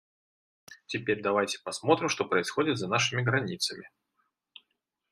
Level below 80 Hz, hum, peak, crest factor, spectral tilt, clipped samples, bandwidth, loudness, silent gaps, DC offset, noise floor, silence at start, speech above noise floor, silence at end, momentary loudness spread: -72 dBFS; none; -8 dBFS; 22 dB; -4 dB/octave; under 0.1%; 13.5 kHz; -28 LUFS; none; under 0.1%; -80 dBFS; 0.7 s; 52 dB; 1.25 s; 6 LU